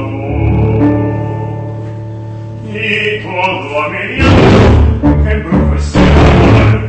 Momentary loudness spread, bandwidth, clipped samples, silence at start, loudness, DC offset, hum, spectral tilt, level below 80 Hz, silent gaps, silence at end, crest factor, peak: 16 LU; 8.6 kHz; 0.1%; 0 s; -10 LUFS; under 0.1%; none; -7.5 dB/octave; -16 dBFS; none; 0 s; 10 dB; 0 dBFS